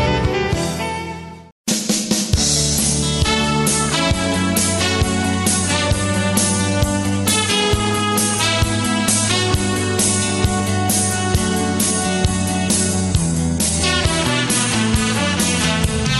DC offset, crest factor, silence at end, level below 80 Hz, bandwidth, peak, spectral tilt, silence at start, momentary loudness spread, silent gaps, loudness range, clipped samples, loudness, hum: under 0.1%; 14 dB; 0 s; -30 dBFS; 13 kHz; -4 dBFS; -3.5 dB/octave; 0 s; 3 LU; 1.52-1.64 s; 1 LU; under 0.1%; -17 LUFS; none